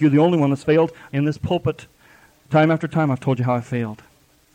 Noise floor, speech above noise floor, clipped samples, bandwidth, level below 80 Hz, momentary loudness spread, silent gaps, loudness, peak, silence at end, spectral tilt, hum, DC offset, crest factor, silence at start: -52 dBFS; 33 dB; under 0.1%; 10 kHz; -52 dBFS; 10 LU; none; -20 LUFS; -6 dBFS; 0.6 s; -8 dB/octave; none; under 0.1%; 14 dB; 0 s